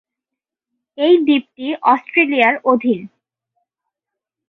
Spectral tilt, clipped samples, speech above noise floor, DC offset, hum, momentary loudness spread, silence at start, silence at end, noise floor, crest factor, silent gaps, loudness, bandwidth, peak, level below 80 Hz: -7 dB/octave; under 0.1%; 70 dB; under 0.1%; none; 8 LU; 1 s; 1.4 s; -85 dBFS; 18 dB; none; -15 LUFS; 4.5 kHz; -2 dBFS; -66 dBFS